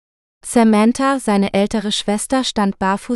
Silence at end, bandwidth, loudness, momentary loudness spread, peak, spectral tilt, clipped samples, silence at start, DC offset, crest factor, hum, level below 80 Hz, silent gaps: 0 s; 12.5 kHz; -16 LUFS; 6 LU; -2 dBFS; -4.5 dB/octave; under 0.1%; 0.45 s; under 0.1%; 14 dB; none; -46 dBFS; none